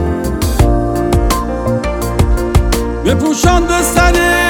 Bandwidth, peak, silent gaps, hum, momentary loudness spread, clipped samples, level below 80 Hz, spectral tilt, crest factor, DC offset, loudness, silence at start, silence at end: over 20 kHz; 0 dBFS; none; none; 6 LU; under 0.1%; -18 dBFS; -5 dB/octave; 12 dB; under 0.1%; -13 LUFS; 0 s; 0 s